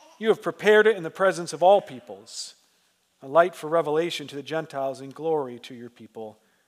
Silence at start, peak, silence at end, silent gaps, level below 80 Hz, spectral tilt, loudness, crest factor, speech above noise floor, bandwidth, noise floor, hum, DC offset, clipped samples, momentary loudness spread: 0.2 s; -4 dBFS; 0.35 s; none; -86 dBFS; -4.5 dB/octave; -23 LUFS; 20 dB; 43 dB; 14.5 kHz; -67 dBFS; none; under 0.1%; under 0.1%; 21 LU